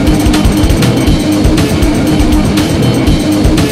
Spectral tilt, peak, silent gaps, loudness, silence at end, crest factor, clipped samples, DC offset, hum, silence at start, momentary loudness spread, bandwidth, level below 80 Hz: -6 dB/octave; 0 dBFS; none; -10 LUFS; 0 s; 8 dB; 0.4%; 0.7%; none; 0 s; 1 LU; 16 kHz; -16 dBFS